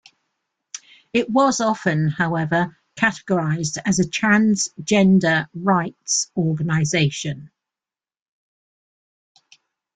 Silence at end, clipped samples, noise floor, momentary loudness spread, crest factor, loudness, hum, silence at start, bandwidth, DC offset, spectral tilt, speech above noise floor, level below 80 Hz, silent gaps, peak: 2.5 s; under 0.1%; under -90 dBFS; 12 LU; 16 dB; -20 LUFS; none; 0.75 s; 9.4 kHz; under 0.1%; -4.5 dB/octave; over 71 dB; -58 dBFS; none; -6 dBFS